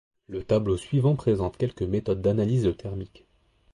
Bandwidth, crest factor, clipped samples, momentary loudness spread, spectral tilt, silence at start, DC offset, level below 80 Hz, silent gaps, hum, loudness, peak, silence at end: 11 kHz; 16 dB; under 0.1%; 14 LU; -8.5 dB/octave; 0.3 s; under 0.1%; -46 dBFS; none; none; -26 LUFS; -12 dBFS; 0.7 s